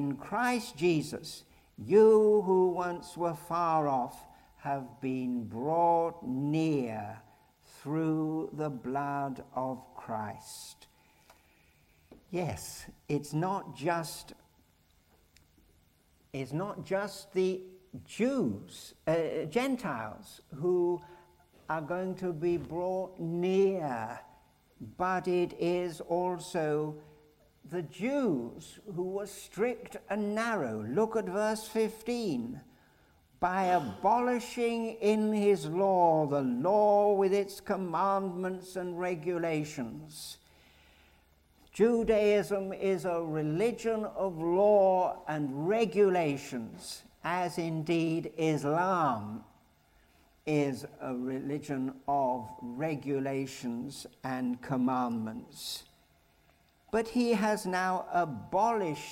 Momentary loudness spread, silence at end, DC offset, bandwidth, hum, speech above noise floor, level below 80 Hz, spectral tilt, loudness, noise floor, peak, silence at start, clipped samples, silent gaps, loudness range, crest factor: 15 LU; 0 s; under 0.1%; 16 kHz; none; 36 dB; -66 dBFS; -6 dB/octave; -31 LUFS; -67 dBFS; -12 dBFS; 0 s; under 0.1%; none; 10 LU; 18 dB